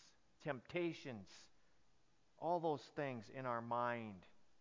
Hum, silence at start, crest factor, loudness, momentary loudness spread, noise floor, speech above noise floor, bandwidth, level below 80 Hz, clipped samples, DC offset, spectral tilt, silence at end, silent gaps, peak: none; 0 s; 18 dB; -45 LUFS; 14 LU; -78 dBFS; 34 dB; 7.6 kHz; -80 dBFS; under 0.1%; under 0.1%; -6.5 dB/octave; 0.15 s; none; -28 dBFS